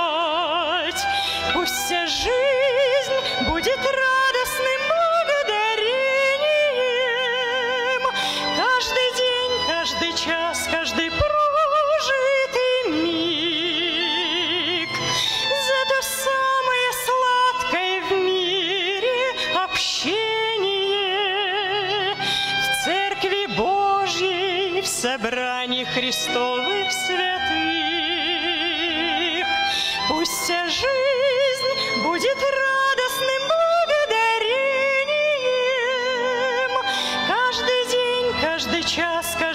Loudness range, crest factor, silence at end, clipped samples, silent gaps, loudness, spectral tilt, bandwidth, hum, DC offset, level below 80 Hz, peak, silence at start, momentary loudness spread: 1 LU; 12 dB; 0 s; under 0.1%; none; -20 LUFS; -2 dB/octave; 16 kHz; none; under 0.1%; -50 dBFS; -10 dBFS; 0 s; 3 LU